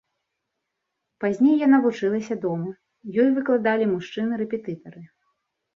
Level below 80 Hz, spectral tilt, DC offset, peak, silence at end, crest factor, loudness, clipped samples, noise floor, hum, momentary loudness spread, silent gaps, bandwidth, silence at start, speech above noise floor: -70 dBFS; -7.5 dB/octave; under 0.1%; -6 dBFS; 0.7 s; 16 dB; -22 LUFS; under 0.1%; -80 dBFS; none; 13 LU; none; 7 kHz; 1.2 s; 58 dB